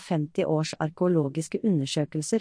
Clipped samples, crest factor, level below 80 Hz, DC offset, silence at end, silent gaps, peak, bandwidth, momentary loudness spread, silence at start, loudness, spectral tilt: under 0.1%; 14 dB; -66 dBFS; under 0.1%; 0 s; none; -14 dBFS; 10.5 kHz; 4 LU; 0 s; -27 LUFS; -6 dB/octave